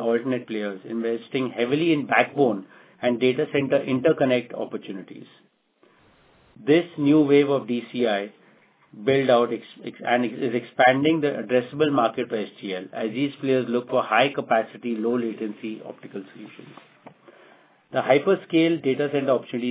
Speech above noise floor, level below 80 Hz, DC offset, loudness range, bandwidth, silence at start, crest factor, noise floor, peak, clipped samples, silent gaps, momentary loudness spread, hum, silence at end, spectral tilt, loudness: 38 dB; -72 dBFS; under 0.1%; 4 LU; 4 kHz; 0 s; 20 dB; -61 dBFS; -2 dBFS; under 0.1%; none; 14 LU; none; 0 s; -10 dB/octave; -23 LUFS